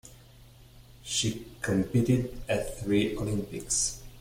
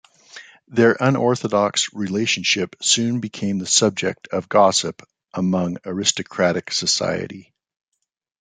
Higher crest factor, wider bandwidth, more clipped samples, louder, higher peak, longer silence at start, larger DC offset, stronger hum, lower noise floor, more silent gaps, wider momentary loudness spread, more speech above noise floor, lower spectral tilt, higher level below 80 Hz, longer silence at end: about the same, 18 dB vs 20 dB; first, 16.5 kHz vs 9.8 kHz; neither; second, -29 LUFS vs -19 LUFS; second, -12 dBFS vs -2 dBFS; second, 0.05 s vs 0.35 s; neither; neither; first, -53 dBFS vs -44 dBFS; neither; second, 6 LU vs 9 LU; about the same, 25 dB vs 24 dB; about the same, -4.5 dB/octave vs -3.5 dB/octave; first, -48 dBFS vs -64 dBFS; second, 0 s vs 1 s